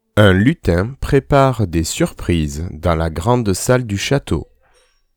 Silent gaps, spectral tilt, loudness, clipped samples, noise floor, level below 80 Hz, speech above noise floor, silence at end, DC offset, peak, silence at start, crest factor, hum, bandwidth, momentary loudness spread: none; -6 dB/octave; -16 LUFS; under 0.1%; -56 dBFS; -32 dBFS; 41 dB; 0.75 s; under 0.1%; 0 dBFS; 0.15 s; 16 dB; none; 19.5 kHz; 7 LU